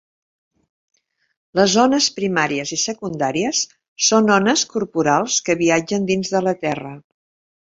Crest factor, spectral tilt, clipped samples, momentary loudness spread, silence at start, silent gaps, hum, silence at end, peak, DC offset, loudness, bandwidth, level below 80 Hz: 18 dB; -3 dB/octave; under 0.1%; 9 LU; 1.55 s; 3.88-3.96 s; none; 0.65 s; -2 dBFS; under 0.1%; -18 LUFS; 8 kHz; -58 dBFS